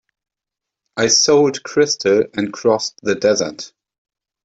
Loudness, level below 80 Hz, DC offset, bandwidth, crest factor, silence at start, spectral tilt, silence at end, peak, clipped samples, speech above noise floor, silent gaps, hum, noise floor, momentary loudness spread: -16 LUFS; -60 dBFS; under 0.1%; 8 kHz; 16 dB; 0.95 s; -2.5 dB/octave; 0.75 s; -2 dBFS; under 0.1%; 68 dB; none; none; -85 dBFS; 13 LU